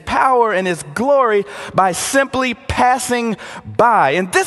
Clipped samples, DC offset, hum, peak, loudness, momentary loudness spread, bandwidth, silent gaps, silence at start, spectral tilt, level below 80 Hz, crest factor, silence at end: under 0.1%; under 0.1%; none; 0 dBFS; -15 LUFS; 7 LU; 13 kHz; none; 0.05 s; -4 dB/octave; -42 dBFS; 16 dB; 0 s